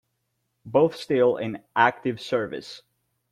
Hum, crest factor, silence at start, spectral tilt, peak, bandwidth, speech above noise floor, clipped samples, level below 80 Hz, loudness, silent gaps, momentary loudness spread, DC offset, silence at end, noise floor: none; 22 dB; 0.65 s; -6 dB/octave; -4 dBFS; 12 kHz; 52 dB; under 0.1%; -66 dBFS; -24 LUFS; none; 14 LU; under 0.1%; 0.55 s; -76 dBFS